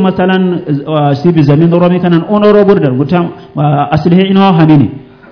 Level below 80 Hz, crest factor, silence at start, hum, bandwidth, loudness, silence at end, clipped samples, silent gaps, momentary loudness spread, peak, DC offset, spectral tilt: -42 dBFS; 8 dB; 0 s; none; 5.4 kHz; -9 LUFS; 0.3 s; 4%; none; 7 LU; 0 dBFS; under 0.1%; -9.5 dB/octave